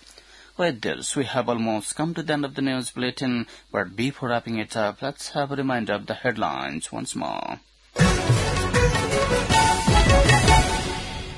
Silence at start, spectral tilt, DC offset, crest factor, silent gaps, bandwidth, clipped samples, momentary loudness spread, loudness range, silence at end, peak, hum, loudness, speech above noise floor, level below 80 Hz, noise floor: 0.6 s; -4.5 dB/octave; under 0.1%; 18 dB; none; 12 kHz; under 0.1%; 12 LU; 8 LU; 0 s; -4 dBFS; none; -23 LUFS; 23 dB; -32 dBFS; -49 dBFS